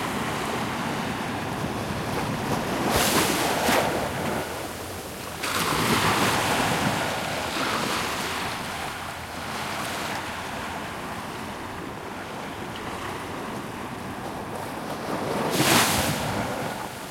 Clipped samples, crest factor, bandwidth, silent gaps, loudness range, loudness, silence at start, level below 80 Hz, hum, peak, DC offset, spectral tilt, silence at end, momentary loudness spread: under 0.1%; 22 dB; 16.5 kHz; none; 9 LU; -26 LUFS; 0 s; -50 dBFS; none; -6 dBFS; under 0.1%; -3.5 dB/octave; 0 s; 12 LU